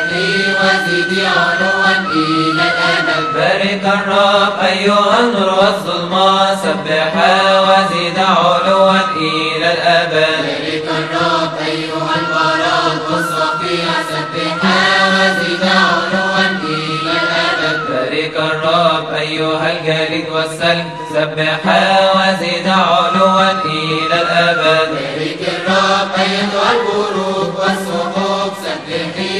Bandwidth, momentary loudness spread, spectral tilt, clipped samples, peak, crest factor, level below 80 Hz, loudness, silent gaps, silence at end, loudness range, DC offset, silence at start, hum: 13 kHz; 7 LU; -4.5 dB/octave; under 0.1%; 0 dBFS; 14 dB; -54 dBFS; -13 LUFS; none; 0 s; 3 LU; 0.2%; 0 s; none